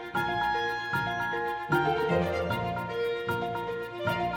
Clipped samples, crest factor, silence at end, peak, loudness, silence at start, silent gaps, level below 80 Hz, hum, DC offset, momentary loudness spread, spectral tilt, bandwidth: under 0.1%; 18 dB; 0 s; -12 dBFS; -30 LUFS; 0 s; none; -54 dBFS; none; under 0.1%; 5 LU; -6 dB/octave; 17 kHz